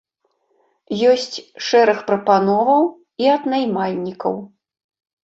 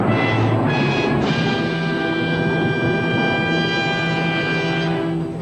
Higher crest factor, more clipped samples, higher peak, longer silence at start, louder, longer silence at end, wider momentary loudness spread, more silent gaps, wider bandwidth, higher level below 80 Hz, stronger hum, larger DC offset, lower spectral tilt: about the same, 16 dB vs 14 dB; neither; first, -2 dBFS vs -6 dBFS; first, 0.9 s vs 0 s; about the same, -18 LUFS vs -19 LUFS; first, 0.8 s vs 0 s; first, 10 LU vs 3 LU; neither; second, 7.8 kHz vs 9.2 kHz; second, -66 dBFS vs -46 dBFS; neither; neither; second, -5 dB/octave vs -6.5 dB/octave